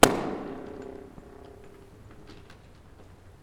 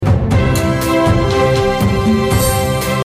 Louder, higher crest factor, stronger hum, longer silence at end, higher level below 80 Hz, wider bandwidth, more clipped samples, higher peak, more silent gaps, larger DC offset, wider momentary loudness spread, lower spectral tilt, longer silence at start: second, -30 LUFS vs -14 LUFS; first, 30 dB vs 10 dB; neither; about the same, 0.1 s vs 0 s; second, -50 dBFS vs -24 dBFS; first, 19 kHz vs 16 kHz; neither; about the same, 0 dBFS vs -2 dBFS; neither; neither; first, 19 LU vs 2 LU; second, -3 dB/octave vs -5.5 dB/octave; about the same, 0 s vs 0 s